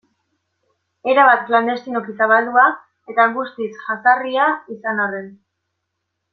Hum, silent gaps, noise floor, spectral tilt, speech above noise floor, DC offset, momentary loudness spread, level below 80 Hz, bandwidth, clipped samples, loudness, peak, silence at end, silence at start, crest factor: none; none; -76 dBFS; -6 dB/octave; 59 dB; under 0.1%; 14 LU; -70 dBFS; 6.2 kHz; under 0.1%; -17 LUFS; -2 dBFS; 1 s; 1.05 s; 18 dB